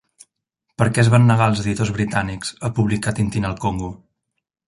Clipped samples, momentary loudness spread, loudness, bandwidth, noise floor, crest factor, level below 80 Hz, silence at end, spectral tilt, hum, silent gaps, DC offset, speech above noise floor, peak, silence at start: under 0.1%; 12 LU; -19 LUFS; 11.5 kHz; -76 dBFS; 18 dB; -42 dBFS; 0.7 s; -6 dB/octave; none; none; under 0.1%; 58 dB; -2 dBFS; 0.8 s